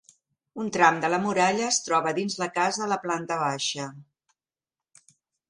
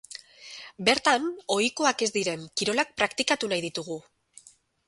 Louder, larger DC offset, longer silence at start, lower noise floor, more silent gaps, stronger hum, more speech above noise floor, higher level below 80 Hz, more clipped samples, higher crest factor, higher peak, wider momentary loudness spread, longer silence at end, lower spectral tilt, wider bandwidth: about the same, -25 LUFS vs -26 LUFS; neither; first, 0.55 s vs 0.1 s; first, under -90 dBFS vs -55 dBFS; neither; neither; first, over 65 dB vs 28 dB; second, -72 dBFS vs -66 dBFS; neither; about the same, 24 dB vs 22 dB; about the same, -4 dBFS vs -6 dBFS; second, 11 LU vs 19 LU; first, 1.5 s vs 0.9 s; about the same, -3 dB/octave vs -2.5 dB/octave; about the same, 11.5 kHz vs 11.5 kHz